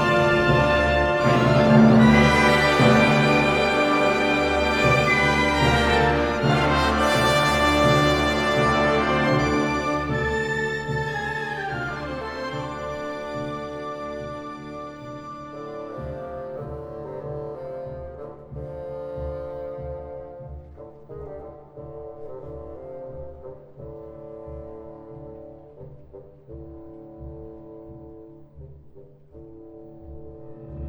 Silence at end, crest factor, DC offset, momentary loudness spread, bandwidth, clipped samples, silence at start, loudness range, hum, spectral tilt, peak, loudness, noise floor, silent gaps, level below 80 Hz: 0 s; 20 dB; under 0.1%; 24 LU; 16.5 kHz; under 0.1%; 0 s; 24 LU; none; -5.5 dB/octave; -2 dBFS; -20 LUFS; -47 dBFS; none; -40 dBFS